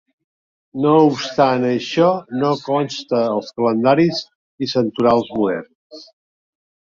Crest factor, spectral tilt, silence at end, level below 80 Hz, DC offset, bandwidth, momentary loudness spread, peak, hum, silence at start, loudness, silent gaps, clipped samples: 16 dB; -6.5 dB/octave; 0.9 s; -60 dBFS; under 0.1%; 7.6 kHz; 7 LU; -2 dBFS; none; 0.75 s; -18 LUFS; 4.35-4.58 s, 5.75-5.90 s; under 0.1%